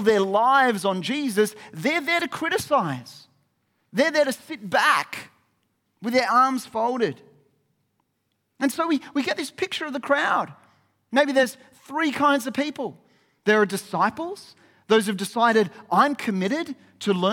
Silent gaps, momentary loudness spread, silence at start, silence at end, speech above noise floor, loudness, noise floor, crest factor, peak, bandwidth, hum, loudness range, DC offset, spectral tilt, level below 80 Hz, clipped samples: none; 11 LU; 0 s; 0 s; 51 dB; -23 LUFS; -74 dBFS; 18 dB; -6 dBFS; 18 kHz; none; 4 LU; under 0.1%; -4.5 dB/octave; -70 dBFS; under 0.1%